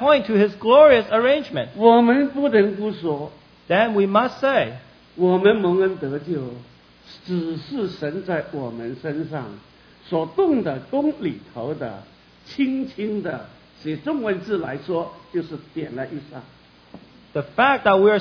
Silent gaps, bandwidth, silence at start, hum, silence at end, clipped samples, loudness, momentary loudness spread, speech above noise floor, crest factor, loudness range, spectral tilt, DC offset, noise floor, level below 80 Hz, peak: none; 5.4 kHz; 0 s; none; 0 s; under 0.1%; -20 LUFS; 16 LU; 26 dB; 20 dB; 11 LU; -8 dB/octave; under 0.1%; -46 dBFS; -58 dBFS; 0 dBFS